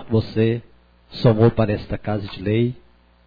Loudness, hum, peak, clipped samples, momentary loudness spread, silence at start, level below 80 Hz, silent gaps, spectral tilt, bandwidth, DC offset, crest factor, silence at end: -21 LUFS; none; -4 dBFS; under 0.1%; 12 LU; 0 s; -42 dBFS; none; -10 dB/octave; 5 kHz; under 0.1%; 18 dB; 0.5 s